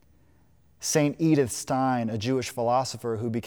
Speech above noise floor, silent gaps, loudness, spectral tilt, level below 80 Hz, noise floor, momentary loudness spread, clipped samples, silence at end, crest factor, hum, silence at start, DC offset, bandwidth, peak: 36 dB; none; -26 LUFS; -5 dB/octave; -64 dBFS; -61 dBFS; 7 LU; under 0.1%; 0 s; 16 dB; none; 0.8 s; under 0.1%; over 20 kHz; -10 dBFS